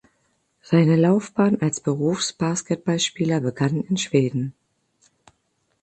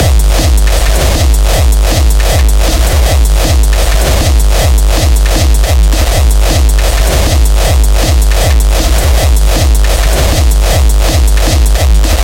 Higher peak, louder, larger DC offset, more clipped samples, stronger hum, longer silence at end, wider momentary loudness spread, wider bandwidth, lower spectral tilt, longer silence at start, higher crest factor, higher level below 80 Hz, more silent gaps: second, -4 dBFS vs 0 dBFS; second, -22 LUFS vs -9 LUFS; neither; neither; neither; first, 1.3 s vs 0 s; first, 7 LU vs 1 LU; second, 9 kHz vs 17 kHz; first, -5.5 dB/octave vs -4 dB/octave; first, 0.7 s vs 0 s; first, 18 dB vs 6 dB; second, -62 dBFS vs -8 dBFS; neither